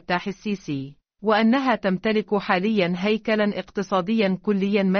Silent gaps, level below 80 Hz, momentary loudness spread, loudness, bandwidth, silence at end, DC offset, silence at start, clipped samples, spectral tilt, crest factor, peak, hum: none; -60 dBFS; 9 LU; -23 LUFS; 6.6 kHz; 0 s; under 0.1%; 0.1 s; under 0.1%; -4.5 dB/octave; 16 dB; -6 dBFS; none